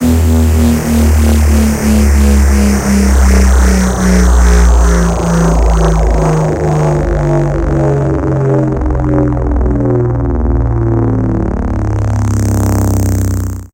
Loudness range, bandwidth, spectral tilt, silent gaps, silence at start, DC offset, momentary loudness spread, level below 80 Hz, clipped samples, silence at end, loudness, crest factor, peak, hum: 4 LU; 16.5 kHz; -6.5 dB/octave; none; 0 s; under 0.1%; 5 LU; -12 dBFS; under 0.1%; 0.1 s; -11 LUFS; 10 dB; 0 dBFS; none